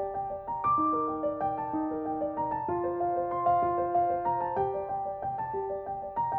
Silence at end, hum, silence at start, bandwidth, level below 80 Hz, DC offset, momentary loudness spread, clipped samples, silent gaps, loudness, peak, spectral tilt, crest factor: 0 s; none; 0 s; 3.8 kHz; -58 dBFS; under 0.1%; 7 LU; under 0.1%; none; -30 LUFS; -16 dBFS; -11 dB/octave; 14 dB